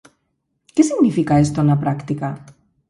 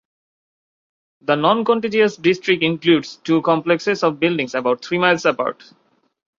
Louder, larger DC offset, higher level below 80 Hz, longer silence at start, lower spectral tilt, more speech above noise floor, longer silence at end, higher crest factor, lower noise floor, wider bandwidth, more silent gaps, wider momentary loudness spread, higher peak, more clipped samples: about the same, -18 LUFS vs -18 LUFS; neither; first, -48 dBFS vs -64 dBFS; second, 0.75 s vs 1.3 s; first, -7.5 dB/octave vs -5.5 dB/octave; second, 54 dB vs over 72 dB; second, 0.4 s vs 0.85 s; about the same, 16 dB vs 18 dB; second, -71 dBFS vs under -90 dBFS; first, 11.5 kHz vs 7.6 kHz; neither; first, 10 LU vs 5 LU; about the same, -2 dBFS vs -2 dBFS; neither